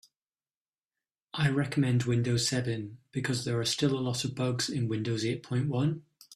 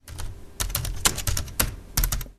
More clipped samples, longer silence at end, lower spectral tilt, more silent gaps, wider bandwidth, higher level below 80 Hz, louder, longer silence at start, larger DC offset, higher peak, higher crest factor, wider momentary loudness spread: neither; about the same, 0 s vs 0.05 s; first, -5 dB/octave vs -2 dB/octave; neither; about the same, 14 kHz vs 14.5 kHz; second, -64 dBFS vs -32 dBFS; second, -30 LUFS vs -26 LUFS; first, 1.35 s vs 0.05 s; neither; second, -14 dBFS vs 0 dBFS; second, 16 dB vs 28 dB; second, 7 LU vs 16 LU